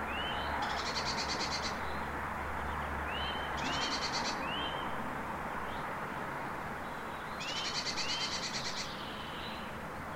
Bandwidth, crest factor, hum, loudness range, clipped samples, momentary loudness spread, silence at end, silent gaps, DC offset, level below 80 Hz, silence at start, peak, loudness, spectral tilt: 16 kHz; 16 dB; none; 2 LU; under 0.1%; 7 LU; 0 s; none; 0.1%; -52 dBFS; 0 s; -22 dBFS; -36 LUFS; -3 dB/octave